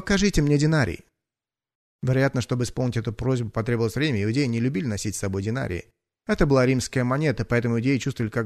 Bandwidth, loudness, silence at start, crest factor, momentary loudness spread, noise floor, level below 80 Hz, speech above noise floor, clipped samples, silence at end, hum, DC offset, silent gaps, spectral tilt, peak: 13 kHz; -24 LUFS; 0 s; 20 dB; 8 LU; under -90 dBFS; -40 dBFS; over 67 dB; under 0.1%; 0 s; none; under 0.1%; 1.75-1.99 s; -6 dB/octave; -4 dBFS